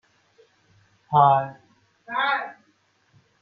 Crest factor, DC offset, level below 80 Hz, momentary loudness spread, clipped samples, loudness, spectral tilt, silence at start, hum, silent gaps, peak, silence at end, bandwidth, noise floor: 22 dB; under 0.1%; -68 dBFS; 17 LU; under 0.1%; -21 LUFS; -7.5 dB/octave; 1.1 s; none; none; -4 dBFS; 0.9 s; 6.2 kHz; -65 dBFS